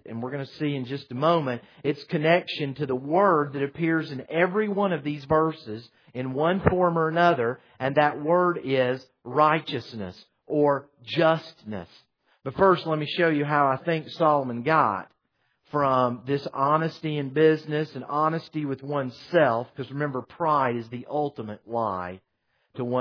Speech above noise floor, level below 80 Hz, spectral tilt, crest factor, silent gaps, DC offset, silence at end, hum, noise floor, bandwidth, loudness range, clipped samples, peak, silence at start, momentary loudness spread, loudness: 48 dB; -58 dBFS; -8 dB/octave; 20 dB; none; under 0.1%; 0 s; none; -73 dBFS; 5.4 kHz; 3 LU; under 0.1%; -6 dBFS; 0.05 s; 12 LU; -25 LUFS